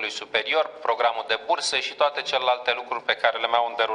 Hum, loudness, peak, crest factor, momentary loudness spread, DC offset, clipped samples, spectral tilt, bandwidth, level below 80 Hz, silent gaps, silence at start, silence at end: none; -24 LUFS; -4 dBFS; 20 dB; 3 LU; under 0.1%; under 0.1%; 0 dB/octave; 11 kHz; -68 dBFS; none; 0 s; 0 s